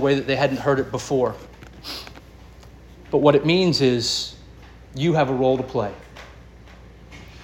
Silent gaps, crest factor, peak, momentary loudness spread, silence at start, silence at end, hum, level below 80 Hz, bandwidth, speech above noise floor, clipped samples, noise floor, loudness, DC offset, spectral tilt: none; 20 dB; -2 dBFS; 23 LU; 0 s; 0 s; none; -46 dBFS; 17 kHz; 24 dB; under 0.1%; -44 dBFS; -21 LUFS; under 0.1%; -5.5 dB/octave